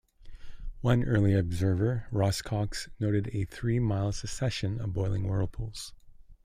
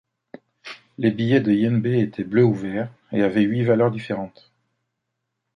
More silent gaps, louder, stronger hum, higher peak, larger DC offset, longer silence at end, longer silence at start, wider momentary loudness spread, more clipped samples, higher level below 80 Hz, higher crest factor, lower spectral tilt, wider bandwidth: neither; second, -30 LUFS vs -21 LUFS; neither; second, -12 dBFS vs -4 dBFS; neither; second, 0.1 s vs 1.3 s; second, 0.2 s vs 0.65 s; second, 11 LU vs 18 LU; neither; first, -44 dBFS vs -60 dBFS; about the same, 16 dB vs 18 dB; second, -6.5 dB/octave vs -9 dB/octave; first, 15 kHz vs 9.6 kHz